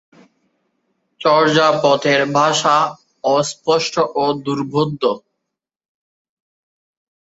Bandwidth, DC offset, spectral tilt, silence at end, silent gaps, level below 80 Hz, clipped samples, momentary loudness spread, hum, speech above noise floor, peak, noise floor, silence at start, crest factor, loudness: 8 kHz; under 0.1%; -4 dB/octave; 2.05 s; none; -62 dBFS; under 0.1%; 8 LU; none; 64 dB; -2 dBFS; -80 dBFS; 1.2 s; 18 dB; -16 LUFS